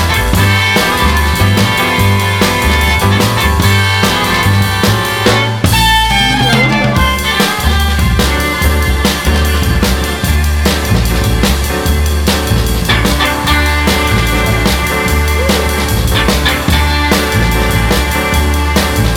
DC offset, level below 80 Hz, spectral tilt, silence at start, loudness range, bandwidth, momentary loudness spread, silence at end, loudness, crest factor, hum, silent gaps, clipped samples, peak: under 0.1%; -16 dBFS; -4.5 dB/octave; 0 s; 2 LU; 19.5 kHz; 3 LU; 0 s; -11 LUFS; 10 dB; none; none; under 0.1%; 0 dBFS